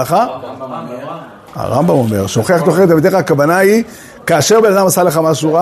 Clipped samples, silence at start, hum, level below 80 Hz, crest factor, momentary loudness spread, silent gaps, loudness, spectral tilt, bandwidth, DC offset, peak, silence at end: under 0.1%; 0 s; none; -50 dBFS; 12 dB; 16 LU; none; -11 LUFS; -5 dB/octave; 13.5 kHz; under 0.1%; 0 dBFS; 0 s